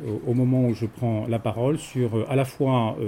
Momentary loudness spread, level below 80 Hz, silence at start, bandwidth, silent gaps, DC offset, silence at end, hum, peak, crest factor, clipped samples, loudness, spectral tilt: 5 LU; -56 dBFS; 0 s; 15.5 kHz; none; under 0.1%; 0 s; none; -10 dBFS; 14 dB; under 0.1%; -24 LUFS; -8 dB/octave